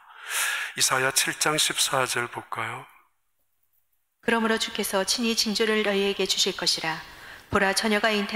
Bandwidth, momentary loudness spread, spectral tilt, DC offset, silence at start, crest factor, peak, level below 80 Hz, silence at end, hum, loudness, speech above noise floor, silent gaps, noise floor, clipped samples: 16 kHz; 10 LU; -2 dB/octave; under 0.1%; 0.1 s; 18 dB; -8 dBFS; -58 dBFS; 0 s; none; -24 LUFS; 51 dB; none; -76 dBFS; under 0.1%